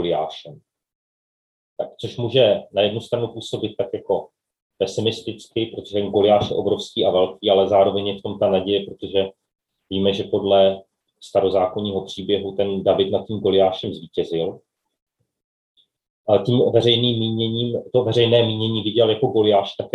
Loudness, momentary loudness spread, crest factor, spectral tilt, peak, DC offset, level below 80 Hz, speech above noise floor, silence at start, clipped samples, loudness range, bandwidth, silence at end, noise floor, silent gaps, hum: -20 LUFS; 11 LU; 18 dB; -6.5 dB/octave; -2 dBFS; under 0.1%; -60 dBFS; over 70 dB; 0 s; under 0.1%; 5 LU; 11.5 kHz; 0.05 s; under -90 dBFS; 0.95-1.76 s, 4.62-4.70 s, 15.02-15.06 s, 15.44-15.75 s, 16.10-16.24 s; none